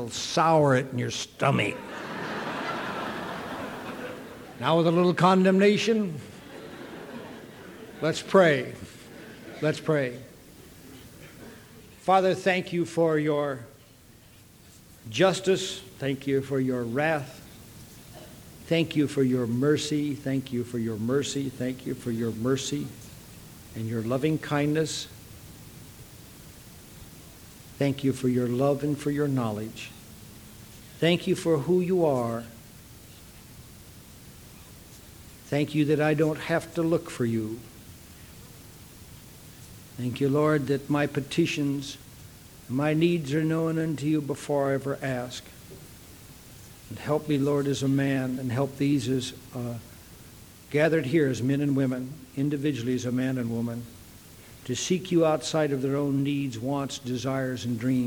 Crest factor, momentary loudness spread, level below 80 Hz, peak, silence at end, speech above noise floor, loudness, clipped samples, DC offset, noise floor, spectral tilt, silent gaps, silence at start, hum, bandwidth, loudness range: 22 dB; 23 LU; -58 dBFS; -6 dBFS; 0 s; 27 dB; -27 LUFS; under 0.1%; under 0.1%; -53 dBFS; -6 dB/octave; none; 0 s; none; over 20 kHz; 6 LU